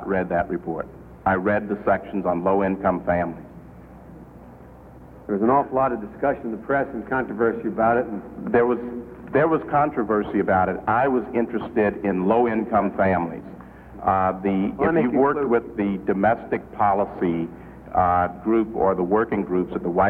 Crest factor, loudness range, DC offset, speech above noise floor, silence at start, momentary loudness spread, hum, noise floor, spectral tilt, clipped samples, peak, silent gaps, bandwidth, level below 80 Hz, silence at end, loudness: 16 dB; 4 LU; under 0.1%; 22 dB; 0 s; 9 LU; none; -44 dBFS; -10 dB/octave; under 0.1%; -6 dBFS; none; 4.4 kHz; -48 dBFS; 0 s; -22 LUFS